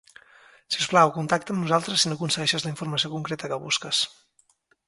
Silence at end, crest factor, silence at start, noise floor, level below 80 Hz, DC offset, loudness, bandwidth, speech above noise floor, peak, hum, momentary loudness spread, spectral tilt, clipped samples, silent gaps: 0.8 s; 22 dB; 0.7 s; -65 dBFS; -66 dBFS; under 0.1%; -24 LUFS; 11.5 kHz; 40 dB; -4 dBFS; none; 10 LU; -3.5 dB/octave; under 0.1%; none